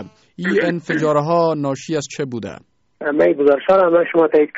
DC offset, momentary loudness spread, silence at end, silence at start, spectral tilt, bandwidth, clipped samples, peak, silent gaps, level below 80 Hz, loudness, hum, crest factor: under 0.1%; 12 LU; 0 s; 0 s; -5.5 dB/octave; 8 kHz; under 0.1%; -4 dBFS; none; -60 dBFS; -17 LUFS; none; 14 dB